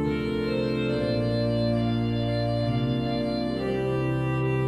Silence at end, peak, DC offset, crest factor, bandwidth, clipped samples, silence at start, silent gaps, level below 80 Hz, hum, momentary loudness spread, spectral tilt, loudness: 0 s; -14 dBFS; under 0.1%; 12 dB; 11 kHz; under 0.1%; 0 s; none; -44 dBFS; none; 2 LU; -8.5 dB/octave; -26 LUFS